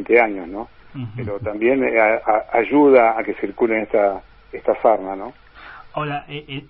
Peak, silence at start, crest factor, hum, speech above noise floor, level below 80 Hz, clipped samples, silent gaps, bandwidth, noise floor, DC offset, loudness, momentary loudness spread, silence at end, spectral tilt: 0 dBFS; 0 s; 18 dB; none; 22 dB; -50 dBFS; under 0.1%; none; 5.2 kHz; -41 dBFS; under 0.1%; -18 LUFS; 18 LU; 0.05 s; -11 dB/octave